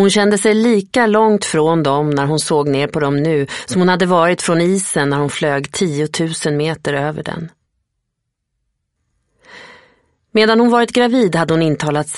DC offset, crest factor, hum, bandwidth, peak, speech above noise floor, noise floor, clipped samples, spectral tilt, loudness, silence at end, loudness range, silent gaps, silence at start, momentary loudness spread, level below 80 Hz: under 0.1%; 16 dB; none; 11.5 kHz; 0 dBFS; 60 dB; -75 dBFS; under 0.1%; -5 dB/octave; -15 LUFS; 0 s; 10 LU; none; 0 s; 7 LU; -54 dBFS